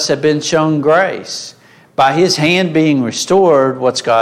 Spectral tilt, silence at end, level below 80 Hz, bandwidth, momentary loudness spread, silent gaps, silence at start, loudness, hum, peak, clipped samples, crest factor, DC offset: -4.5 dB/octave; 0 s; -58 dBFS; 15 kHz; 12 LU; none; 0 s; -12 LUFS; none; -2 dBFS; under 0.1%; 12 dB; under 0.1%